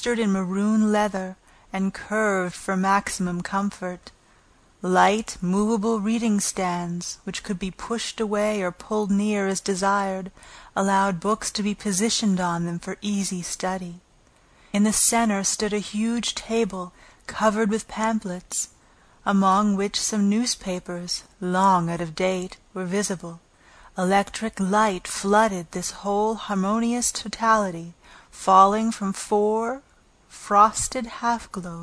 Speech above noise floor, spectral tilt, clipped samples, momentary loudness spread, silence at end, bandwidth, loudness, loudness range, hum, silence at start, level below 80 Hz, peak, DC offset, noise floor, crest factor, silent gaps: 34 dB; -4 dB/octave; under 0.1%; 12 LU; 0 s; 11 kHz; -23 LUFS; 4 LU; none; 0 s; -52 dBFS; -2 dBFS; under 0.1%; -57 dBFS; 22 dB; none